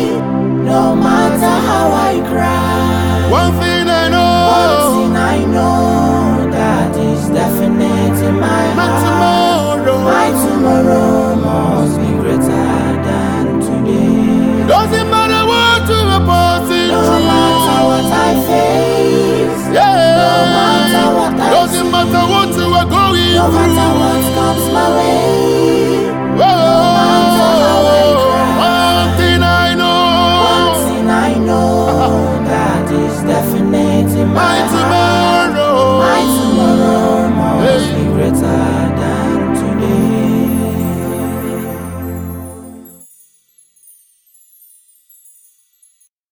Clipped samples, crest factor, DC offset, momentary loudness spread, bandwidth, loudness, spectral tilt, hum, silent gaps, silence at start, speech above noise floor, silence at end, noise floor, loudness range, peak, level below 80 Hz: under 0.1%; 12 dB; under 0.1%; 5 LU; 19 kHz; -11 LUFS; -5.5 dB/octave; none; none; 0 s; 42 dB; 3.45 s; -53 dBFS; 4 LU; 0 dBFS; -32 dBFS